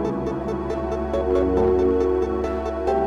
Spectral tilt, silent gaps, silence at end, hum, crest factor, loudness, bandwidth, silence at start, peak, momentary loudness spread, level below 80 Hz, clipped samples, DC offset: -8.5 dB/octave; none; 0 s; none; 10 dB; -22 LUFS; 7.6 kHz; 0 s; -10 dBFS; 7 LU; -34 dBFS; under 0.1%; under 0.1%